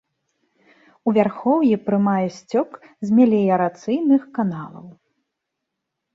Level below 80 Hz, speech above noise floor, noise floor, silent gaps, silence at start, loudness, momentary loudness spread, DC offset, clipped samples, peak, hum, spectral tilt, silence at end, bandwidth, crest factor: -66 dBFS; 61 dB; -80 dBFS; none; 1.05 s; -19 LUFS; 11 LU; under 0.1%; under 0.1%; -4 dBFS; none; -8.5 dB/octave; 1.25 s; 7.4 kHz; 18 dB